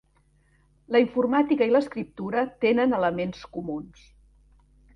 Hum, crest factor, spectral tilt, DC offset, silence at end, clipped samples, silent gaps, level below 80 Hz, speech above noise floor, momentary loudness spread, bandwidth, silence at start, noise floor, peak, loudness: none; 18 dB; -7.5 dB/octave; under 0.1%; 1.1 s; under 0.1%; none; -58 dBFS; 39 dB; 12 LU; 6.8 kHz; 0.9 s; -63 dBFS; -8 dBFS; -25 LUFS